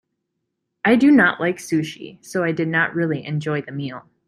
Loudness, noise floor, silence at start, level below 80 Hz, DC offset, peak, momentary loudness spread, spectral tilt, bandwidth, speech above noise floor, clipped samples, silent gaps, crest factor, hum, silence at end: -19 LUFS; -77 dBFS; 0.85 s; -64 dBFS; under 0.1%; -4 dBFS; 16 LU; -6 dB/octave; 13.5 kHz; 58 dB; under 0.1%; none; 16 dB; none; 0.3 s